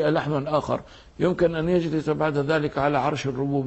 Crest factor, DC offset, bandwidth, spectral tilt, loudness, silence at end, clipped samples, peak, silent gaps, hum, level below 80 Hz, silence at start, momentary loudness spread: 16 dB; under 0.1%; 8.2 kHz; -7 dB/octave; -24 LUFS; 0 s; under 0.1%; -8 dBFS; none; none; -50 dBFS; 0 s; 4 LU